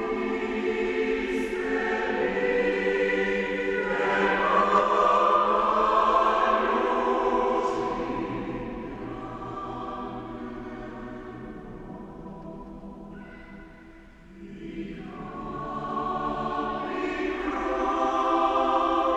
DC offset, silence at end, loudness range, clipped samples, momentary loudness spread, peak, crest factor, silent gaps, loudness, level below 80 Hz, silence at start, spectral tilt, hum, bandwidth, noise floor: under 0.1%; 0 s; 19 LU; under 0.1%; 20 LU; -8 dBFS; 18 dB; none; -26 LUFS; -50 dBFS; 0 s; -5.5 dB/octave; none; 11.5 kHz; -48 dBFS